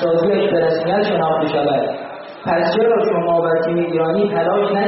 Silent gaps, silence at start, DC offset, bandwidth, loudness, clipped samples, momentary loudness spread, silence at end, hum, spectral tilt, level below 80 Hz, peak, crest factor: none; 0 s; under 0.1%; 5.8 kHz; -17 LUFS; under 0.1%; 5 LU; 0 s; none; -4.5 dB/octave; -56 dBFS; -6 dBFS; 10 dB